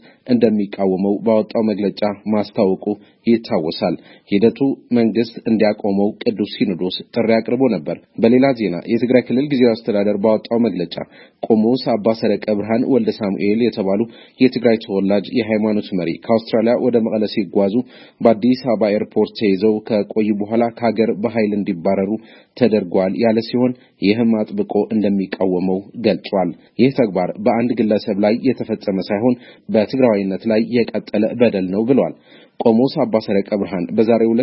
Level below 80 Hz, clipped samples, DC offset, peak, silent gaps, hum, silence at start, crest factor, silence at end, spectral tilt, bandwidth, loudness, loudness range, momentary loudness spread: -60 dBFS; under 0.1%; under 0.1%; 0 dBFS; none; none; 0.25 s; 16 dB; 0 s; -10.5 dB/octave; 5.8 kHz; -18 LUFS; 2 LU; 6 LU